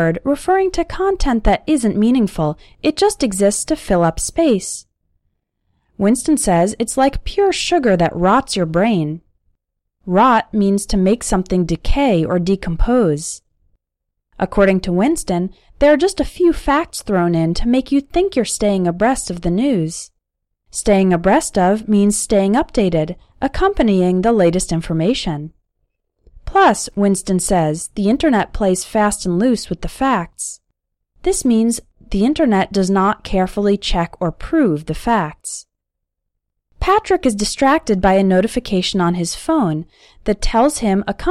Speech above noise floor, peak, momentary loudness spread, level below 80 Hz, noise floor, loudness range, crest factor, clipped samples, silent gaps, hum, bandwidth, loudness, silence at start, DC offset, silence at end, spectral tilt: 62 dB; -2 dBFS; 8 LU; -30 dBFS; -78 dBFS; 3 LU; 14 dB; under 0.1%; none; none; 15 kHz; -16 LUFS; 0 s; under 0.1%; 0 s; -5 dB/octave